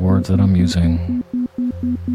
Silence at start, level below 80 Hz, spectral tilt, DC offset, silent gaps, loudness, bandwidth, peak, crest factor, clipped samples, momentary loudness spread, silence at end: 0 s; -32 dBFS; -7.5 dB/octave; under 0.1%; none; -18 LUFS; 11 kHz; -2 dBFS; 14 dB; under 0.1%; 8 LU; 0 s